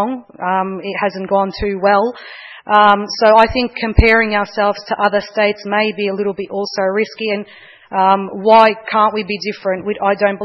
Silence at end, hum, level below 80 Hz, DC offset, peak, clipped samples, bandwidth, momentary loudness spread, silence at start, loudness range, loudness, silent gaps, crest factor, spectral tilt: 0 s; none; -32 dBFS; under 0.1%; 0 dBFS; 0.1%; 6.6 kHz; 11 LU; 0 s; 4 LU; -15 LUFS; none; 16 dB; -6 dB/octave